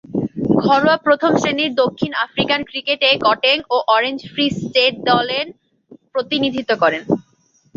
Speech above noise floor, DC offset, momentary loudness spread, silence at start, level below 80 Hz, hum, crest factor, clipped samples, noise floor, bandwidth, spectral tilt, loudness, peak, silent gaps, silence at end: 41 dB; under 0.1%; 8 LU; 0.1 s; -54 dBFS; none; 16 dB; under 0.1%; -58 dBFS; 7.6 kHz; -5 dB/octave; -17 LUFS; -2 dBFS; none; 0.55 s